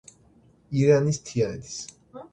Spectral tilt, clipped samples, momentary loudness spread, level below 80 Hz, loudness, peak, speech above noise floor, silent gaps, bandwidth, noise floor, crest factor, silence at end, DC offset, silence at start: -6 dB/octave; under 0.1%; 19 LU; -58 dBFS; -24 LUFS; -6 dBFS; 35 dB; none; 9.4 kHz; -58 dBFS; 20 dB; 0.1 s; under 0.1%; 0.7 s